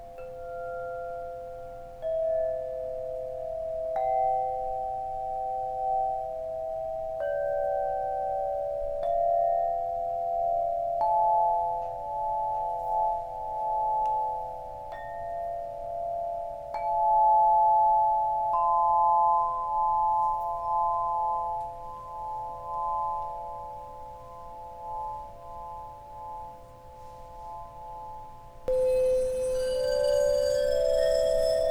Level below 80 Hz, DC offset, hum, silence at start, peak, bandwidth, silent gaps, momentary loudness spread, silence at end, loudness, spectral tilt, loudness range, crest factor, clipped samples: -50 dBFS; under 0.1%; none; 0 s; -14 dBFS; 15 kHz; none; 18 LU; 0 s; -28 LUFS; -4 dB/octave; 13 LU; 14 dB; under 0.1%